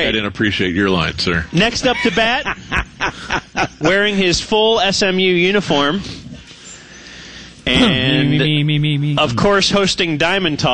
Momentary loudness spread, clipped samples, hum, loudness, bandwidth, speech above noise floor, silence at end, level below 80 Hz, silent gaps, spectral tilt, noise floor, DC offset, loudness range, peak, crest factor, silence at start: 20 LU; under 0.1%; none; -15 LUFS; 10 kHz; 22 dB; 0 s; -38 dBFS; none; -4.5 dB/octave; -37 dBFS; under 0.1%; 3 LU; -2 dBFS; 14 dB; 0 s